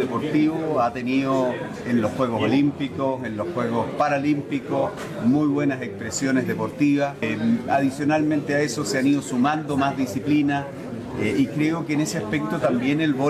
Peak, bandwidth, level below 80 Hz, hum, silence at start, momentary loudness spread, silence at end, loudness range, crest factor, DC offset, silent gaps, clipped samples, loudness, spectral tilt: -10 dBFS; 14 kHz; -56 dBFS; none; 0 s; 5 LU; 0 s; 2 LU; 14 dB; under 0.1%; none; under 0.1%; -23 LUFS; -6 dB/octave